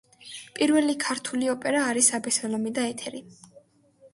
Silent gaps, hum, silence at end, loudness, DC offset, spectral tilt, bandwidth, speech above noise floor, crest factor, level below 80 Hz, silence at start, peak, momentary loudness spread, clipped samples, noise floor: none; none; 0.05 s; -25 LUFS; under 0.1%; -2 dB/octave; 11.5 kHz; 32 dB; 20 dB; -72 dBFS; 0.2 s; -6 dBFS; 18 LU; under 0.1%; -58 dBFS